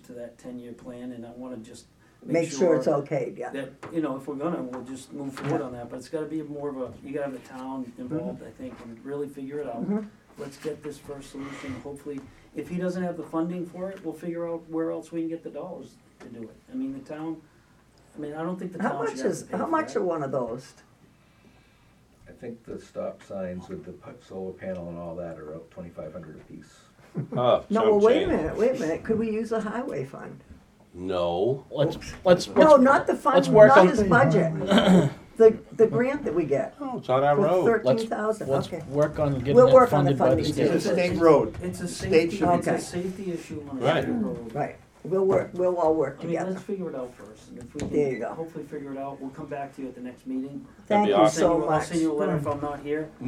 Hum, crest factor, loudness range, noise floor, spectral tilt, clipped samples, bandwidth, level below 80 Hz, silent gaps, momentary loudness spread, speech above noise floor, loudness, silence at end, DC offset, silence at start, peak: none; 24 dB; 18 LU; -58 dBFS; -6.5 dB/octave; under 0.1%; 14.5 kHz; -54 dBFS; none; 20 LU; 33 dB; -24 LUFS; 0 s; under 0.1%; 0.1 s; 0 dBFS